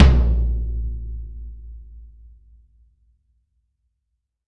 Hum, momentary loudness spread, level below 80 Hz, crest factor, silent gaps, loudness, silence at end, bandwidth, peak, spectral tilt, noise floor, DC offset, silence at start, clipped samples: none; 24 LU; -24 dBFS; 20 dB; none; -23 LUFS; 2.5 s; 5.8 kHz; -2 dBFS; -8 dB/octave; -76 dBFS; under 0.1%; 0 s; under 0.1%